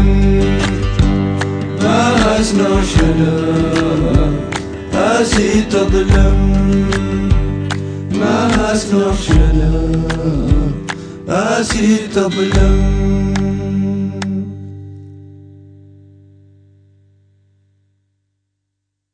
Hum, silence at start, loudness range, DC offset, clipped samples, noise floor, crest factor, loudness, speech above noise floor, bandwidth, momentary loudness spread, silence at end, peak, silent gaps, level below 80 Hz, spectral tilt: 50 Hz at -30 dBFS; 0 s; 7 LU; under 0.1%; under 0.1%; -74 dBFS; 14 dB; -14 LUFS; 62 dB; 10 kHz; 8 LU; 3.65 s; 0 dBFS; none; -20 dBFS; -6 dB/octave